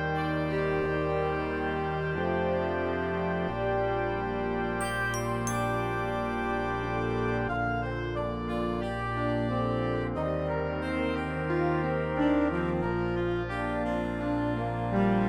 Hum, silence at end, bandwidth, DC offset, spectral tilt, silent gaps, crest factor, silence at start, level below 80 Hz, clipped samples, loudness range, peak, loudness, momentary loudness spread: none; 0 s; 16.5 kHz; 0.2%; -6.5 dB/octave; none; 14 dB; 0 s; -44 dBFS; under 0.1%; 2 LU; -14 dBFS; -30 LUFS; 3 LU